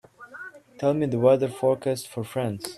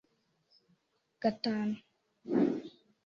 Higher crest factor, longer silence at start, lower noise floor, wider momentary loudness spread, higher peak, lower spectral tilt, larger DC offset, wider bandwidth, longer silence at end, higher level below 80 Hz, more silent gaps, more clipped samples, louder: about the same, 18 dB vs 18 dB; second, 0.2 s vs 1.2 s; second, -43 dBFS vs -76 dBFS; first, 21 LU vs 17 LU; first, -6 dBFS vs -18 dBFS; about the same, -6.5 dB/octave vs -7.5 dB/octave; neither; first, 14 kHz vs 7.2 kHz; second, 0 s vs 0.35 s; first, -66 dBFS vs -76 dBFS; neither; neither; first, -24 LUFS vs -34 LUFS